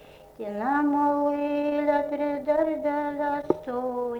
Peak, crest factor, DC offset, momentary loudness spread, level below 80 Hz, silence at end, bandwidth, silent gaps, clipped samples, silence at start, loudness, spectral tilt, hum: -6 dBFS; 20 dB; under 0.1%; 6 LU; -60 dBFS; 0 s; 6.2 kHz; none; under 0.1%; 0.05 s; -26 LUFS; -7 dB/octave; none